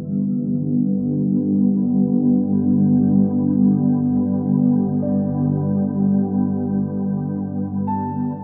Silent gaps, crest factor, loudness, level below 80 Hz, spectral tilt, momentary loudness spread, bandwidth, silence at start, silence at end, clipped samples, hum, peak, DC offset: none; 12 dB; -19 LUFS; -66 dBFS; -15.5 dB/octave; 7 LU; 1.9 kHz; 0 s; 0 s; under 0.1%; 50 Hz at -40 dBFS; -6 dBFS; under 0.1%